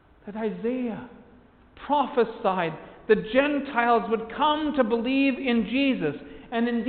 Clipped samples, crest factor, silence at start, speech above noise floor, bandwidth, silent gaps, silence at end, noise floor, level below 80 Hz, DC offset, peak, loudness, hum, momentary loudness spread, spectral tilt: under 0.1%; 18 dB; 0.25 s; 29 dB; 4.6 kHz; none; 0 s; -54 dBFS; -56 dBFS; under 0.1%; -8 dBFS; -25 LUFS; none; 10 LU; -3.5 dB/octave